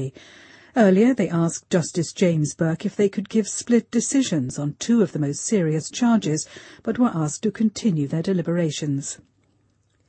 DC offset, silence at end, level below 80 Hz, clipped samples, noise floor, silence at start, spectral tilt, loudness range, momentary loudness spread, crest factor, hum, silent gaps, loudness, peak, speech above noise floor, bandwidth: under 0.1%; 0.95 s; -62 dBFS; under 0.1%; -64 dBFS; 0 s; -5.5 dB/octave; 3 LU; 8 LU; 18 dB; none; none; -22 LUFS; -4 dBFS; 43 dB; 8.8 kHz